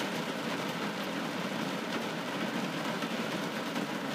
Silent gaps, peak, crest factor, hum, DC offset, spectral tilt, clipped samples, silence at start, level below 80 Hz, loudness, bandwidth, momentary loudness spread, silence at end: none; -22 dBFS; 14 dB; none; under 0.1%; -4.5 dB/octave; under 0.1%; 0 s; -78 dBFS; -34 LUFS; 15.5 kHz; 1 LU; 0 s